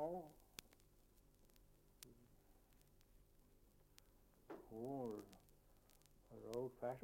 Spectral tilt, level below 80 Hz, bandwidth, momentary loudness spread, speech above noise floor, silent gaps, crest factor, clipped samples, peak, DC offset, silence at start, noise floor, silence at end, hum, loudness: -6 dB/octave; -74 dBFS; 16.5 kHz; 16 LU; 23 dB; none; 26 dB; under 0.1%; -28 dBFS; under 0.1%; 0 s; -72 dBFS; 0 s; none; -52 LUFS